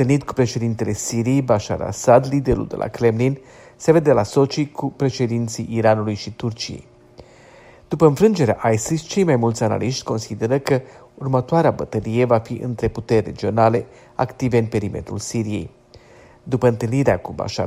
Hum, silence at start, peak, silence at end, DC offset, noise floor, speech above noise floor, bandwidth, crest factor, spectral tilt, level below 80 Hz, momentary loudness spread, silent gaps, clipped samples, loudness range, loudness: none; 0 s; 0 dBFS; 0 s; under 0.1%; -47 dBFS; 28 dB; 15.5 kHz; 20 dB; -6.5 dB/octave; -46 dBFS; 10 LU; none; under 0.1%; 4 LU; -20 LUFS